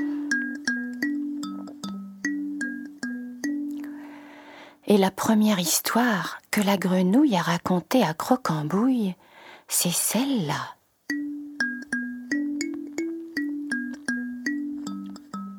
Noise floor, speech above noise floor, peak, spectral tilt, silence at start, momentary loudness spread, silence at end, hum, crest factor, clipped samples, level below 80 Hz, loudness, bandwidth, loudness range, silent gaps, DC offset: -47 dBFS; 24 dB; -4 dBFS; -4 dB/octave; 0 s; 15 LU; 0 s; none; 22 dB; under 0.1%; -70 dBFS; -26 LUFS; over 20 kHz; 9 LU; none; under 0.1%